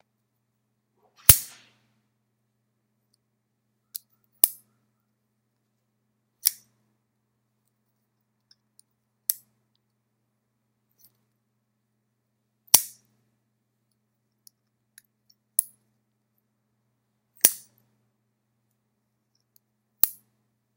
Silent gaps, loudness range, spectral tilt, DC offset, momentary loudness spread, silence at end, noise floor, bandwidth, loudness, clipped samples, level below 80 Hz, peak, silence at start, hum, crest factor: none; 13 LU; -0.5 dB/octave; under 0.1%; 24 LU; 0.65 s; -77 dBFS; 16 kHz; -21 LUFS; under 0.1%; -52 dBFS; 0 dBFS; 1.3 s; none; 32 dB